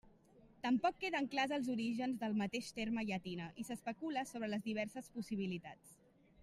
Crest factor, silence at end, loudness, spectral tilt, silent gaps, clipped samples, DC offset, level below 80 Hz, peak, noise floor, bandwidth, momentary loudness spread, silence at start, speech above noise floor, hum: 20 dB; 0 s; -41 LUFS; -5 dB/octave; none; under 0.1%; under 0.1%; -74 dBFS; -22 dBFS; -66 dBFS; 15 kHz; 9 LU; 0.05 s; 26 dB; none